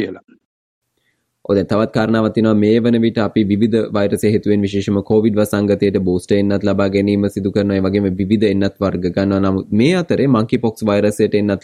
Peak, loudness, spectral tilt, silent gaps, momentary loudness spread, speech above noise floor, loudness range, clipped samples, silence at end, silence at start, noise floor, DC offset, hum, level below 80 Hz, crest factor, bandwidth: -2 dBFS; -16 LUFS; -7.5 dB/octave; 0.45-0.82 s; 4 LU; 52 dB; 1 LU; under 0.1%; 0.05 s; 0 s; -66 dBFS; under 0.1%; none; -50 dBFS; 14 dB; 14.5 kHz